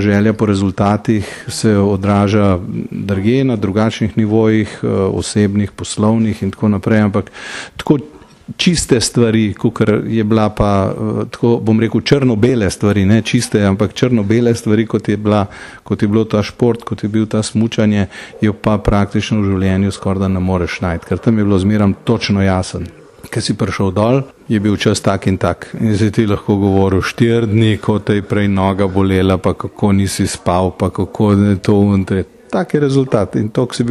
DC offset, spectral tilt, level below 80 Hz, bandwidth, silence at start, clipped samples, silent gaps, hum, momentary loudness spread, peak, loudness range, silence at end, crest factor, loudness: under 0.1%; -6.5 dB/octave; -38 dBFS; 12.5 kHz; 0 s; under 0.1%; none; none; 6 LU; 0 dBFS; 2 LU; 0 s; 14 dB; -15 LUFS